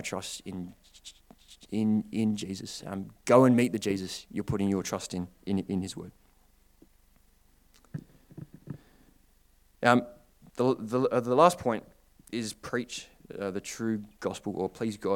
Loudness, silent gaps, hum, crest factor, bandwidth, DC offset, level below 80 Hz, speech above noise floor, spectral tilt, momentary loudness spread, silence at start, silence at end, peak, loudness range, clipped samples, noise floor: -29 LUFS; none; none; 26 dB; 17.5 kHz; under 0.1%; -62 dBFS; 34 dB; -5.5 dB/octave; 23 LU; 0 s; 0 s; -4 dBFS; 14 LU; under 0.1%; -63 dBFS